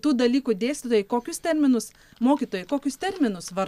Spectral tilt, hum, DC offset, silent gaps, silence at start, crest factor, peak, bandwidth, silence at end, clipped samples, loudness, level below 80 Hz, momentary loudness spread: -4.5 dB/octave; none; under 0.1%; none; 0.05 s; 16 dB; -8 dBFS; 15 kHz; 0 s; under 0.1%; -24 LUFS; -60 dBFS; 6 LU